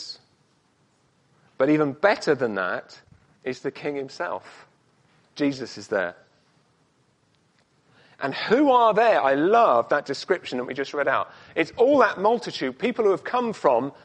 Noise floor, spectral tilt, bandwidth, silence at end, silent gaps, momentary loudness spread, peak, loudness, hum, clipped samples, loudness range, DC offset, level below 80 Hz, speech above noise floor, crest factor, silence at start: -65 dBFS; -5.5 dB/octave; 9.8 kHz; 0.15 s; none; 13 LU; -4 dBFS; -23 LUFS; none; under 0.1%; 11 LU; under 0.1%; -68 dBFS; 42 dB; 20 dB; 0 s